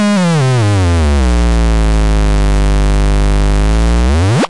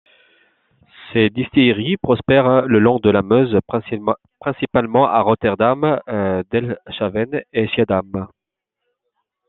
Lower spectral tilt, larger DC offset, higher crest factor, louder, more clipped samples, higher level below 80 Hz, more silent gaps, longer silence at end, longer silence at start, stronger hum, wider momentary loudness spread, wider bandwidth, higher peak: second, -6 dB/octave vs -10 dB/octave; neither; second, 4 dB vs 16 dB; first, -12 LUFS vs -17 LUFS; neither; first, -12 dBFS vs -52 dBFS; neither; second, 0 s vs 1.2 s; second, 0 s vs 1 s; neither; second, 2 LU vs 10 LU; first, 11.5 kHz vs 4.2 kHz; second, -6 dBFS vs -2 dBFS